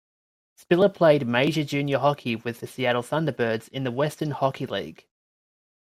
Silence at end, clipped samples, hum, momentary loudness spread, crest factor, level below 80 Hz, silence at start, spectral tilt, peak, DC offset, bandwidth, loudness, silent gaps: 0.95 s; under 0.1%; none; 11 LU; 18 dB; -66 dBFS; 0.7 s; -6.5 dB/octave; -6 dBFS; under 0.1%; 15.5 kHz; -24 LUFS; none